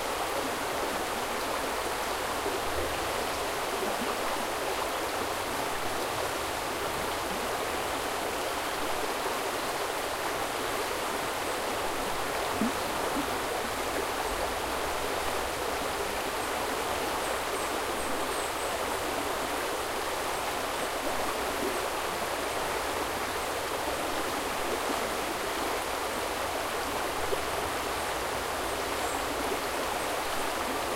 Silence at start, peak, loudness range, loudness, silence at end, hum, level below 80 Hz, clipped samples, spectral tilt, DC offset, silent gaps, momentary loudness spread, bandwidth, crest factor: 0 s; -16 dBFS; 0 LU; -31 LUFS; 0 s; none; -50 dBFS; under 0.1%; -2.5 dB/octave; under 0.1%; none; 1 LU; 16 kHz; 16 dB